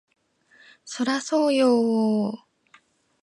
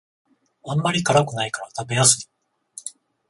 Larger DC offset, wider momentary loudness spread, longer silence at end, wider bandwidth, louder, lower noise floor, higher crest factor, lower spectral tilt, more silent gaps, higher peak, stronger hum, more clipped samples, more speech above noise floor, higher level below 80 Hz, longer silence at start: neither; second, 13 LU vs 23 LU; first, 0.85 s vs 0.4 s; about the same, 11.5 kHz vs 11.5 kHz; about the same, -22 LUFS vs -20 LUFS; first, -59 dBFS vs -46 dBFS; second, 14 dB vs 22 dB; first, -5 dB/octave vs -3 dB/octave; neither; second, -10 dBFS vs -2 dBFS; neither; neither; first, 37 dB vs 25 dB; second, -78 dBFS vs -58 dBFS; first, 0.85 s vs 0.65 s